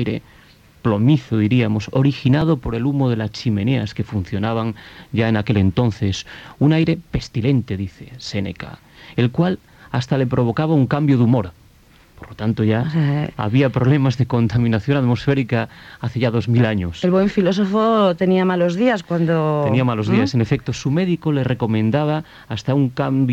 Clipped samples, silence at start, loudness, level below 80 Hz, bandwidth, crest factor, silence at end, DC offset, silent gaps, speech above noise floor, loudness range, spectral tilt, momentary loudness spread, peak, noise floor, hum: under 0.1%; 0 s; -19 LUFS; -44 dBFS; 8 kHz; 14 dB; 0 s; under 0.1%; none; 32 dB; 4 LU; -8 dB/octave; 10 LU; -4 dBFS; -50 dBFS; none